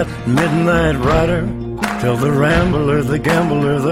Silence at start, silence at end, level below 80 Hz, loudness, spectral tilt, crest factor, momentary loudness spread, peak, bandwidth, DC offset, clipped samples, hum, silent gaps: 0 s; 0 s; -30 dBFS; -15 LUFS; -6.5 dB/octave; 14 dB; 6 LU; -2 dBFS; 16 kHz; under 0.1%; under 0.1%; none; none